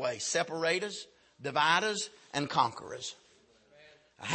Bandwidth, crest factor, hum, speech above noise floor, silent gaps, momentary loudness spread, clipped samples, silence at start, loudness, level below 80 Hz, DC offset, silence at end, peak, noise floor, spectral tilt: 8.8 kHz; 22 dB; none; 32 dB; none; 16 LU; under 0.1%; 0 s; -31 LUFS; -76 dBFS; under 0.1%; 0 s; -12 dBFS; -64 dBFS; -2.5 dB/octave